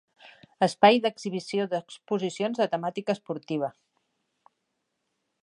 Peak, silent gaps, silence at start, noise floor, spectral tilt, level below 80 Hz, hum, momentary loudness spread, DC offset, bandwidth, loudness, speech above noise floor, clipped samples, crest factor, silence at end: -6 dBFS; none; 0.25 s; -79 dBFS; -5 dB/octave; -78 dBFS; none; 13 LU; under 0.1%; 11 kHz; -27 LUFS; 53 dB; under 0.1%; 22 dB; 1.75 s